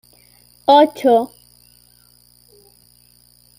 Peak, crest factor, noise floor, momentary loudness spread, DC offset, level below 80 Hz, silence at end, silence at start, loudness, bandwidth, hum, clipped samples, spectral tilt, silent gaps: -2 dBFS; 18 dB; -52 dBFS; 12 LU; under 0.1%; -62 dBFS; 2.35 s; 0.7 s; -14 LUFS; 16 kHz; 60 Hz at -50 dBFS; under 0.1%; -4.5 dB/octave; none